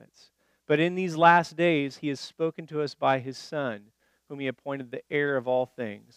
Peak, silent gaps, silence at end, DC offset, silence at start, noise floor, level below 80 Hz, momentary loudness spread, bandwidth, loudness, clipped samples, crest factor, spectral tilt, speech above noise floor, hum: -4 dBFS; none; 0.2 s; under 0.1%; 0.7 s; -62 dBFS; -80 dBFS; 15 LU; 13 kHz; -27 LUFS; under 0.1%; 22 dB; -6 dB/octave; 35 dB; none